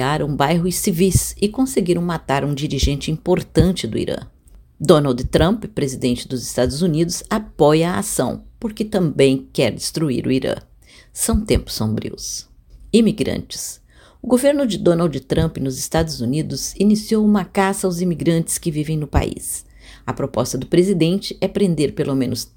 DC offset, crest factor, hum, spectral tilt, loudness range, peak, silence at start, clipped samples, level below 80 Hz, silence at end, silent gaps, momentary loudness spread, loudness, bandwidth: under 0.1%; 18 dB; none; -5.5 dB/octave; 3 LU; 0 dBFS; 0 s; under 0.1%; -34 dBFS; 0.1 s; none; 10 LU; -19 LUFS; 17 kHz